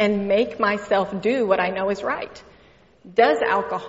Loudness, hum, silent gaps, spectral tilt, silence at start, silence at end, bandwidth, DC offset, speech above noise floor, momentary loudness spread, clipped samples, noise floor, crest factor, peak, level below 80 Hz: -21 LUFS; none; none; -3.5 dB/octave; 0 s; 0 s; 8 kHz; under 0.1%; 32 dB; 8 LU; under 0.1%; -53 dBFS; 18 dB; -2 dBFS; -56 dBFS